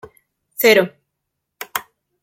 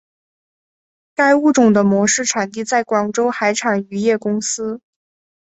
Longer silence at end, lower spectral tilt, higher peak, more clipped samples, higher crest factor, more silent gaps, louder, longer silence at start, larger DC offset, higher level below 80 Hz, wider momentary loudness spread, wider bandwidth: second, 0.45 s vs 0.7 s; about the same, -3 dB/octave vs -4 dB/octave; about the same, 0 dBFS vs -2 dBFS; neither; about the same, 20 dB vs 16 dB; neither; about the same, -17 LUFS vs -16 LUFS; second, 0.6 s vs 1.2 s; neither; about the same, -66 dBFS vs -62 dBFS; first, 21 LU vs 9 LU; first, 16.5 kHz vs 8.2 kHz